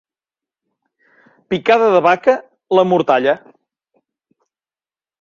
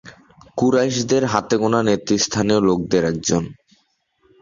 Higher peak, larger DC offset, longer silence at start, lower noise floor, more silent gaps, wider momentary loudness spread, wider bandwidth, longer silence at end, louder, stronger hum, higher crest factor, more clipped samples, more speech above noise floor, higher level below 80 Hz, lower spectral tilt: about the same, 0 dBFS vs 0 dBFS; neither; first, 1.5 s vs 0.05 s; first, under -90 dBFS vs -64 dBFS; neither; first, 9 LU vs 4 LU; about the same, 7.2 kHz vs 7.6 kHz; first, 1.85 s vs 0.9 s; first, -15 LUFS vs -19 LUFS; neither; about the same, 18 dB vs 20 dB; neither; first, over 77 dB vs 46 dB; second, -64 dBFS vs -50 dBFS; first, -6.5 dB/octave vs -4.5 dB/octave